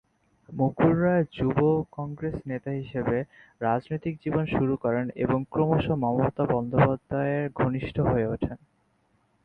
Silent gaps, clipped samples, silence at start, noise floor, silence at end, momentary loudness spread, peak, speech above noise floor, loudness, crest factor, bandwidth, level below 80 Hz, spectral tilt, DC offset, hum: none; under 0.1%; 0.5 s; -68 dBFS; 0.9 s; 9 LU; -8 dBFS; 43 dB; -27 LUFS; 18 dB; 4.7 kHz; -48 dBFS; -10.5 dB/octave; under 0.1%; none